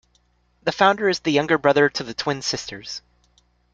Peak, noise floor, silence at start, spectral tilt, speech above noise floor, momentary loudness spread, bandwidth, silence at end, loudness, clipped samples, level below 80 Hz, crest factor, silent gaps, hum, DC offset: -2 dBFS; -63 dBFS; 0.65 s; -4 dB/octave; 43 dB; 15 LU; 9 kHz; 0.75 s; -21 LUFS; under 0.1%; -58 dBFS; 20 dB; none; 60 Hz at -55 dBFS; under 0.1%